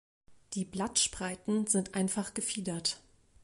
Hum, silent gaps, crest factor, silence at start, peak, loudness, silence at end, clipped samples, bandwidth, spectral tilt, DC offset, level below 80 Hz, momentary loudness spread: none; none; 20 dB; 0.3 s; -14 dBFS; -32 LUFS; 0.45 s; under 0.1%; 11.5 kHz; -3 dB/octave; under 0.1%; -62 dBFS; 9 LU